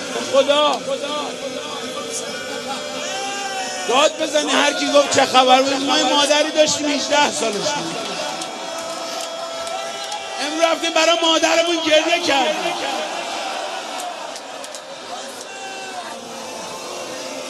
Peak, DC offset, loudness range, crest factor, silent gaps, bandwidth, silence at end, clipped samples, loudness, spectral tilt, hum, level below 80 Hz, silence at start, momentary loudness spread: 0 dBFS; under 0.1%; 12 LU; 20 dB; none; 13 kHz; 0 s; under 0.1%; -19 LUFS; -1.5 dB/octave; none; -66 dBFS; 0 s; 15 LU